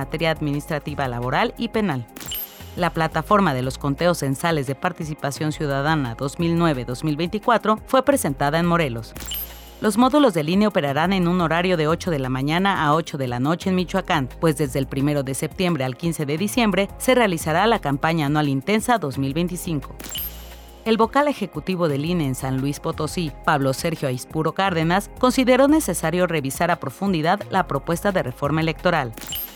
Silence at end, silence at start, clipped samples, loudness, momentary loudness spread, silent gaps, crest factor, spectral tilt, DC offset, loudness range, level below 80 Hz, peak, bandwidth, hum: 0 s; 0 s; under 0.1%; -21 LUFS; 9 LU; none; 16 dB; -5.5 dB/octave; under 0.1%; 3 LU; -42 dBFS; -4 dBFS; over 20 kHz; none